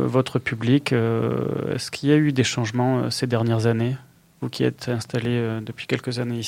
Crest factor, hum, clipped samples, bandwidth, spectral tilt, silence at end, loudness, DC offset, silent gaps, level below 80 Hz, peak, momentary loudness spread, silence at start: 18 dB; none; under 0.1%; 15.5 kHz; -6 dB/octave; 0 s; -23 LUFS; under 0.1%; none; -60 dBFS; -6 dBFS; 8 LU; 0 s